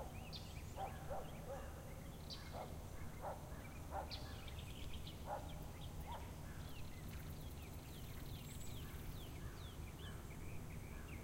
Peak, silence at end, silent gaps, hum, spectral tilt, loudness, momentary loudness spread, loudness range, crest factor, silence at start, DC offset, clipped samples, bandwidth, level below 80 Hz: -32 dBFS; 0 s; none; none; -5 dB/octave; -52 LUFS; 4 LU; 2 LU; 16 dB; 0 s; under 0.1%; under 0.1%; 16 kHz; -54 dBFS